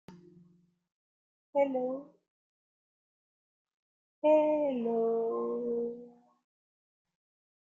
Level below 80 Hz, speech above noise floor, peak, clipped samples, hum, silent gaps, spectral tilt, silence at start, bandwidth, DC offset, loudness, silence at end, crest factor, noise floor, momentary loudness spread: -82 dBFS; 36 dB; -16 dBFS; under 0.1%; none; 0.92-1.53 s, 2.28-3.65 s, 3.74-4.22 s; -8 dB/octave; 0.1 s; 6.8 kHz; under 0.1%; -31 LUFS; 1.65 s; 20 dB; -66 dBFS; 12 LU